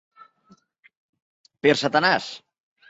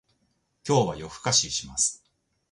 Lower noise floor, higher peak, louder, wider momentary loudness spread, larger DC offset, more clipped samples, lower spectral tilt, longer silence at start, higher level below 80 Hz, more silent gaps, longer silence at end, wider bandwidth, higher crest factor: second, -58 dBFS vs -72 dBFS; first, -4 dBFS vs -8 dBFS; first, -21 LUFS vs -25 LUFS; first, 17 LU vs 9 LU; neither; neither; about the same, -4 dB/octave vs -3 dB/octave; first, 1.65 s vs 0.65 s; second, -70 dBFS vs -56 dBFS; neither; about the same, 0.55 s vs 0.55 s; second, 8 kHz vs 11.5 kHz; about the same, 22 dB vs 20 dB